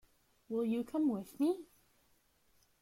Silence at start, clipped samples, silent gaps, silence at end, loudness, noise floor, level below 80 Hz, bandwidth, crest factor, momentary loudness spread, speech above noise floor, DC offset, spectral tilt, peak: 0.5 s; under 0.1%; none; 1.2 s; -36 LUFS; -72 dBFS; -76 dBFS; 16.5 kHz; 14 dB; 6 LU; 37 dB; under 0.1%; -7 dB/octave; -24 dBFS